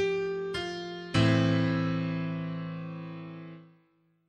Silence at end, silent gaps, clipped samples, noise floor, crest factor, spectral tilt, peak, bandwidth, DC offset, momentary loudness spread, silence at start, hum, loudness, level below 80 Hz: 0.6 s; none; under 0.1%; -69 dBFS; 18 dB; -7 dB/octave; -12 dBFS; 9.8 kHz; under 0.1%; 17 LU; 0 s; none; -30 LUFS; -58 dBFS